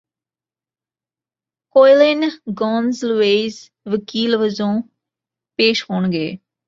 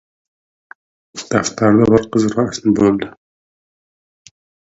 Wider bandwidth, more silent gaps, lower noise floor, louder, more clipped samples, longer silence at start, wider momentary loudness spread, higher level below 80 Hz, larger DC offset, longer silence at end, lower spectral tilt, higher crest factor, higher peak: about the same, 7.6 kHz vs 8 kHz; neither; about the same, under -90 dBFS vs under -90 dBFS; about the same, -17 LUFS vs -15 LUFS; neither; first, 1.75 s vs 1.15 s; second, 13 LU vs 16 LU; second, -64 dBFS vs -48 dBFS; neither; second, 0.3 s vs 1.6 s; about the same, -5.5 dB/octave vs -6 dB/octave; about the same, 18 dB vs 18 dB; about the same, -2 dBFS vs 0 dBFS